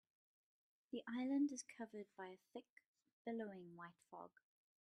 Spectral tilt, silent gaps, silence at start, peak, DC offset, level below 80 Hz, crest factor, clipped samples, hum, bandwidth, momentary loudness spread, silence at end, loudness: -4.5 dB/octave; 2.69-2.77 s, 2.86-2.94 s, 3.13-3.25 s; 0.95 s; -32 dBFS; under 0.1%; under -90 dBFS; 18 dB; under 0.1%; none; 10.5 kHz; 18 LU; 0.6 s; -48 LUFS